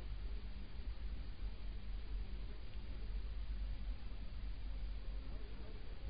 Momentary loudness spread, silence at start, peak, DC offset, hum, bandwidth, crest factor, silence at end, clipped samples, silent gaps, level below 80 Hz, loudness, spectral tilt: 4 LU; 0 s; -32 dBFS; 0.4%; none; 5 kHz; 12 dB; 0 s; under 0.1%; none; -46 dBFS; -50 LUFS; -5.5 dB/octave